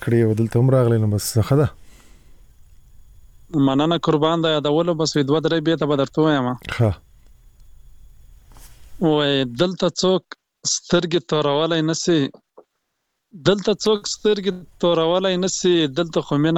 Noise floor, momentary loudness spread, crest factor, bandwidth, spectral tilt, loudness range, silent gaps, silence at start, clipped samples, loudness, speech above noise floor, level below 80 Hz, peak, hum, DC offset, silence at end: -75 dBFS; 5 LU; 20 dB; 17 kHz; -5.5 dB/octave; 4 LU; none; 0 s; under 0.1%; -19 LUFS; 56 dB; -48 dBFS; -2 dBFS; none; under 0.1%; 0 s